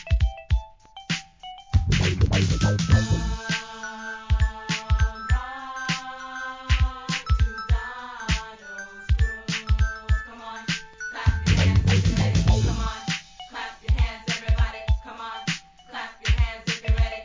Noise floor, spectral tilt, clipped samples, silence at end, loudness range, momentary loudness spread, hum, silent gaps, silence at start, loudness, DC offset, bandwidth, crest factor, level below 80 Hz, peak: -44 dBFS; -5 dB/octave; under 0.1%; 0 s; 4 LU; 14 LU; none; none; 0 s; -25 LUFS; under 0.1%; 7.6 kHz; 18 dB; -26 dBFS; -6 dBFS